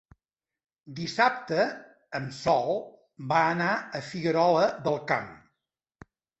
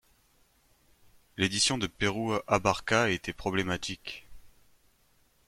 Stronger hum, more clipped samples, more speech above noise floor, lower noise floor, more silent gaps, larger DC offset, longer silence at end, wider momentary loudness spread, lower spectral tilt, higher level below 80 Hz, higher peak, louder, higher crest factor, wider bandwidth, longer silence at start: neither; neither; first, 59 dB vs 37 dB; first, -86 dBFS vs -67 dBFS; neither; neither; about the same, 1.05 s vs 1 s; about the same, 16 LU vs 14 LU; first, -5.5 dB/octave vs -3.5 dB/octave; second, -66 dBFS vs -56 dBFS; about the same, -8 dBFS vs -8 dBFS; about the same, -27 LUFS vs -29 LUFS; about the same, 20 dB vs 24 dB; second, 8.2 kHz vs 16.5 kHz; second, 0.85 s vs 1.35 s